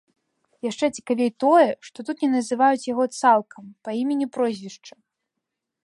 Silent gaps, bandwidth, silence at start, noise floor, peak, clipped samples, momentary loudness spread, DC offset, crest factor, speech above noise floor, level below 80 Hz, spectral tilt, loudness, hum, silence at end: none; 11.5 kHz; 0.65 s; -82 dBFS; -4 dBFS; under 0.1%; 15 LU; under 0.1%; 18 dB; 60 dB; -74 dBFS; -4.5 dB/octave; -22 LUFS; none; 0.95 s